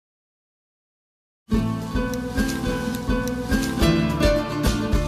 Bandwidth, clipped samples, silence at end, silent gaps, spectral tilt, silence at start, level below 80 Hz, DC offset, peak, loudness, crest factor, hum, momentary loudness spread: 15.5 kHz; under 0.1%; 0 s; none; -5.5 dB/octave; 1.5 s; -30 dBFS; under 0.1%; -6 dBFS; -23 LUFS; 16 dB; none; 6 LU